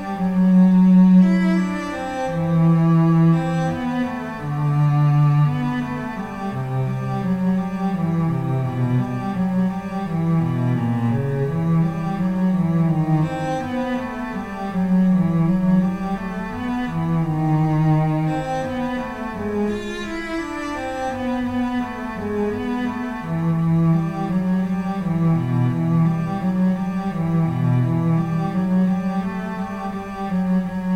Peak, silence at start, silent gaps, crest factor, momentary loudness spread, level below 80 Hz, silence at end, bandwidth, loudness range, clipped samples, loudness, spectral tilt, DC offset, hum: -4 dBFS; 0 s; none; 14 dB; 10 LU; -44 dBFS; 0 s; 8.6 kHz; 5 LU; under 0.1%; -20 LUFS; -9 dB/octave; under 0.1%; none